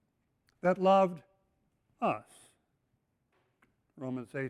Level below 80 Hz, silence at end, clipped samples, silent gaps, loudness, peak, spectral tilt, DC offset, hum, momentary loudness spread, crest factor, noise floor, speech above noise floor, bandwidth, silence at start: -76 dBFS; 0 s; under 0.1%; none; -31 LUFS; -16 dBFS; -7 dB/octave; under 0.1%; none; 16 LU; 18 dB; -78 dBFS; 48 dB; 11.5 kHz; 0.65 s